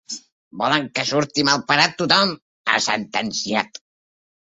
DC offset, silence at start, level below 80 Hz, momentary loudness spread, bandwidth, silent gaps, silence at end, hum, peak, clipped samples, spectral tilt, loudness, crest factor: under 0.1%; 0.1 s; -64 dBFS; 10 LU; 8.2 kHz; 0.32-0.51 s, 2.42-2.65 s; 0.75 s; none; -2 dBFS; under 0.1%; -2.5 dB/octave; -19 LUFS; 20 dB